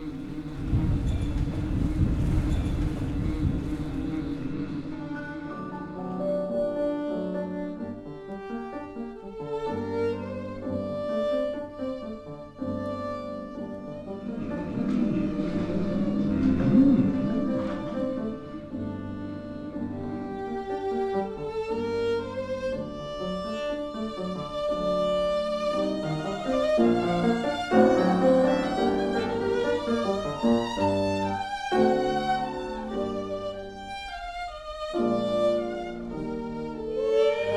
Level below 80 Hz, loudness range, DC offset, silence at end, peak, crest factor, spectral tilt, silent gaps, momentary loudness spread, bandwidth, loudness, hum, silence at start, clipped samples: -40 dBFS; 9 LU; under 0.1%; 0 s; -6 dBFS; 20 dB; -7.5 dB/octave; none; 13 LU; 12 kHz; -28 LUFS; none; 0 s; under 0.1%